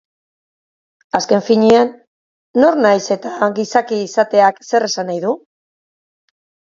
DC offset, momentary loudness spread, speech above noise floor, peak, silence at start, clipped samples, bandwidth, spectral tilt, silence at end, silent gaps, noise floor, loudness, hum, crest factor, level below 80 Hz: under 0.1%; 9 LU; over 76 dB; 0 dBFS; 1.15 s; under 0.1%; 7.6 kHz; -4.5 dB/octave; 1.3 s; 2.07-2.54 s; under -90 dBFS; -15 LUFS; none; 16 dB; -62 dBFS